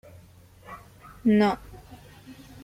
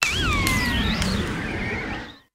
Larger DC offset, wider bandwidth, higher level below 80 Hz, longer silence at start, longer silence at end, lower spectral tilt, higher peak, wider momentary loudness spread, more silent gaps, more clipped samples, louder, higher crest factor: neither; about the same, 15 kHz vs 16 kHz; second, -54 dBFS vs -32 dBFS; first, 0.7 s vs 0 s; first, 0.3 s vs 0.15 s; first, -7 dB/octave vs -4 dB/octave; second, -12 dBFS vs 0 dBFS; first, 26 LU vs 8 LU; neither; neither; about the same, -24 LUFS vs -23 LUFS; second, 18 dB vs 24 dB